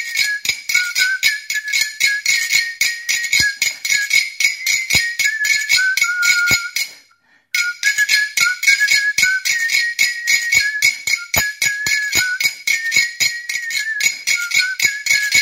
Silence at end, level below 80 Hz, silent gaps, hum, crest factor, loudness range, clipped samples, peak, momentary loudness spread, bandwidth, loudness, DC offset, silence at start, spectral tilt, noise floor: 0 s; -52 dBFS; none; none; 18 dB; 2 LU; under 0.1%; 0 dBFS; 5 LU; 16.5 kHz; -15 LUFS; under 0.1%; 0 s; 2 dB/octave; -55 dBFS